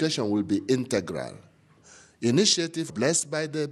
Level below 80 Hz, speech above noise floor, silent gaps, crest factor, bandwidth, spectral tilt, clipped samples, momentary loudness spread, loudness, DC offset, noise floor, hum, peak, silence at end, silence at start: -68 dBFS; 29 dB; none; 18 dB; 13 kHz; -3.5 dB/octave; under 0.1%; 11 LU; -25 LUFS; under 0.1%; -54 dBFS; none; -8 dBFS; 0 s; 0 s